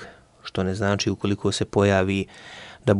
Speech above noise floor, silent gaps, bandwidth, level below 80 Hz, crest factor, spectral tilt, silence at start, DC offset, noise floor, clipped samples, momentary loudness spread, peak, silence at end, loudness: 20 dB; none; 11.5 kHz; -54 dBFS; 18 dB; -5.5 dB/octave; 0 s; under 0.1%; -43 dBFS; under 0.1%; 18 LU; -6 dBFS; 0 s; -23 LUFS